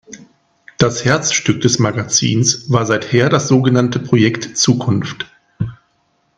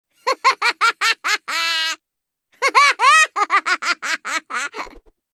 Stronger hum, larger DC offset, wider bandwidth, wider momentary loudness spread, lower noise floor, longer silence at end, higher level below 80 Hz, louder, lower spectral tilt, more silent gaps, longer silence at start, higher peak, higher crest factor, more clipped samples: neither; neither; second, 10.5 kHz vs 15.5 kHz; about the same, 13 LU vs 13 LU; second, -61 dBFS vs -81 dBFS; first, 0.65 s vs 0.35 s; first, -50 dBFS vs -60 dBFS; about the same, -15 LUFS vs -17 LUFS; first, -4.5 dB/octave vs 2 dB/octave; neither; second, 0.1 s vs 0.25 s; about the same, 0 dBFS vs -2 dBFS; about the same, 16 dB vs 18 dB; neither